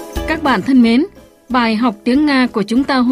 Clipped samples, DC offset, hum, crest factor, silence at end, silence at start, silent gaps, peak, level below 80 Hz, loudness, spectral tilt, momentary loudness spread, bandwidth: under 0.1%; under 0.1%; none; 12 dB; 0 s; 0 s; none; -2 dBFS; -36 dBFS; -14 LUFS; -5.5 dB/octave; 7 LU; 15 kHz